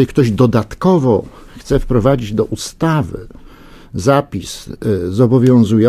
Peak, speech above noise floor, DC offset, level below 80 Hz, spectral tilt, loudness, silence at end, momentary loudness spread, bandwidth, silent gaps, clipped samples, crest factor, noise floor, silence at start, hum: 0 dBFS; 24 dB; under 0.1%; -32 dBFS; -7.5 dB/octave; -15 LUFS; 0 s; 14 LU; 15.5 kHz; none; under 0.1%; 14 dB; -38 dBFS; 0 s; none